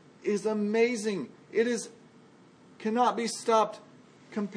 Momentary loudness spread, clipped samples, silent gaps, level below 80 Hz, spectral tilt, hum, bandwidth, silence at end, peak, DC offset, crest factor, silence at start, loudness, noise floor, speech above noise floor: 11 LU; under 0.1%; none; -84 dBFS; -4.5 dB/octave; none; 10.5 kHz; 0 s; -12 dBFS; under 0.1%; 18 dB; 0.25 s; -29 LUFS; -56 dBFS; 28 dB